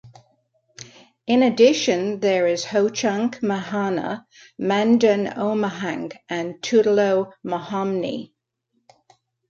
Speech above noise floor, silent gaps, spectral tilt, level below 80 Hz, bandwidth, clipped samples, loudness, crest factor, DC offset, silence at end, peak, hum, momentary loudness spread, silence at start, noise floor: 52 dB; none; -5 dB/octave; -68 dBFS; 7.6 kHz; under 0.1%; -21 LUFS; 18 dB; under 0.1%; 1.25 s; -4 dBFS; none; 13 LU; 0.05 s; -73 dBFS